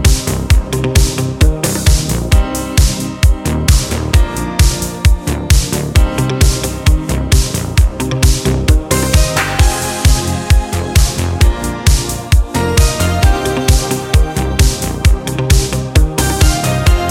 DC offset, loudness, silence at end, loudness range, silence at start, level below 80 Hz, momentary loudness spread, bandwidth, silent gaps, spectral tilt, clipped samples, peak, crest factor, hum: under 0.1%; -13 LUFS; 0 s; 1 LU; 0 s; -14 dBFS; 3 LU; 16.5 kHz; none; -4.5 dB/octave; under 0.1%; 0 dBFS; 12 dB; none